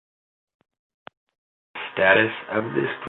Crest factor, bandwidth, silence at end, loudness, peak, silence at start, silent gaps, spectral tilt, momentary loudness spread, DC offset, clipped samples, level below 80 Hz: 22 dB; 4.2 kHz; 0 s; -21 LUFS; -4 dBFS; 1.75 s; none; -8.5 dB/octave; 17 LU; under 0.1%; under 0.1%; -66 dBFS